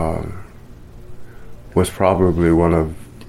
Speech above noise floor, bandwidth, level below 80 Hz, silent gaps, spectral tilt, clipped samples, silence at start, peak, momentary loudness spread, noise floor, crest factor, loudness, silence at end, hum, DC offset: 23 dB; 14.5 kHz; -34 dBFS; none; -7.5 dB/octave; under 0.1%; 0 s; -2 dBFS; 14 LU; -38 dBFS; 18 dB; -17 LUFS; 0 s; none; under 0.1%